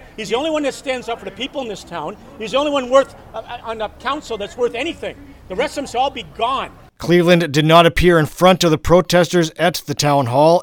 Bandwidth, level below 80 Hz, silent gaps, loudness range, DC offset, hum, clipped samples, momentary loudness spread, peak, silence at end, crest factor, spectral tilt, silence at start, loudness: 19 kHz; -38 dBFS; none; 9 LU; under 0.1%; none; under 0.1%; 16 LU; 0 dBFS; 0 s; 16 dB; -5 dB/octave; 0.2 s; -17 LUFS